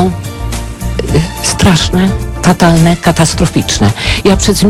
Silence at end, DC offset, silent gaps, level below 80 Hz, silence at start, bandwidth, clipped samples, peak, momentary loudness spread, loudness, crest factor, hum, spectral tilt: 0 s; under 0.1%; none; -20 dBFS; 0 s; 16 kHz; under 0.1%; 0 dBFS; 11 LU; -10 LUFS; 10 dB; none; -5 dB/octave